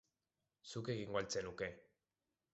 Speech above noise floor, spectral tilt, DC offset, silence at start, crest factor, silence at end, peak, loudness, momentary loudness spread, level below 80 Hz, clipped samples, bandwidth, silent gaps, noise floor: over 46 dB; -4 dB/octave; under 0.1%; 0.65 s; 22 dB; 0.75 s; -26 dBFS; -44 LUFS; 15 LU; -72 dBFS; under 0.1%; 8 kHz; none; under -90 dBFS